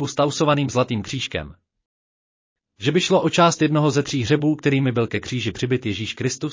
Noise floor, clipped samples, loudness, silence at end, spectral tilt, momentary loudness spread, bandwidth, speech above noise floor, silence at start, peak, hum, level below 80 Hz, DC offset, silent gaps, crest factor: under -90 dBFS; under 0.1%; -21 LUFS; 0 s; -5.5 dB/octave; 9 LU; 7.6 kHz; over 70 dB; 0 s; -4 dBFS; none; -50 dBFS; under 0.1%; 1.86-2.56 s; 16 dB